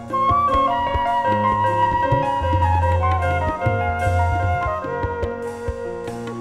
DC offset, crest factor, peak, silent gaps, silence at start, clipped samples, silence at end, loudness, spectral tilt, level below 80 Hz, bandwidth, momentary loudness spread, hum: under 0.1%; 14 dB; -6 dBFS; none; 0 s; under 0.1%; 0 s; -20 LUFS; -7 dB/octave; -32 dBFS; 11 kHz; 10 LU; none